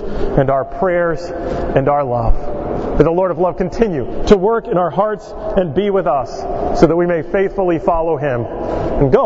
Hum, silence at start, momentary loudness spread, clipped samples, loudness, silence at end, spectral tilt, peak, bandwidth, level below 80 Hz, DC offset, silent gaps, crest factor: none; 0 s; 8 LU; under 0.1%; -16 LUFS; 0 s; -8 dB/octave; 0 dBFS; 7.8 kHz; -26 dBFS; under 0.1%; none; 14 dB